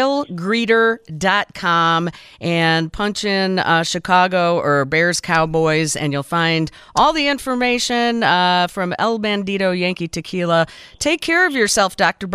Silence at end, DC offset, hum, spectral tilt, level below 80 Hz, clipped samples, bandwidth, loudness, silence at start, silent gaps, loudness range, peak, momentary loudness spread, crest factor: 0 s; under 0.1%; none; -4 dB/octave; -48 dBFS; under 0.1%; 15.5 kHz; -17 LUFS; 0 s; none; 2 LU; -2 dBFS; 6 LU; 16 dB